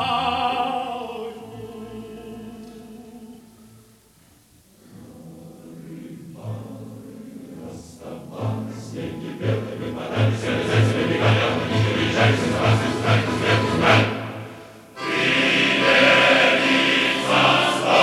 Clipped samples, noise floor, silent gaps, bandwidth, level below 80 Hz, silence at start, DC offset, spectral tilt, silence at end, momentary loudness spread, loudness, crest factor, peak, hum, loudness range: under 0.1%; -54 dBFS; none; 13 kHz; -52 dBFS; 0 s; under 0.1%; -5 dB/octave; 0 s; 23 LU; -19 LUFS; 18 dB; -4 dBFS; none; 22 LU